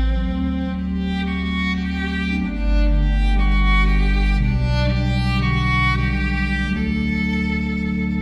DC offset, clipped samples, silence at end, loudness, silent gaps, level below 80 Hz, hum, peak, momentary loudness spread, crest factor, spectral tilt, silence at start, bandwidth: under 0.1%; under 0.1%; 0 s; -20 LUFS; none; -20 dBFS; none; -6 dBFS; 5 LU; 12 dB; -7 dB/octave; 0 s; 8 kHz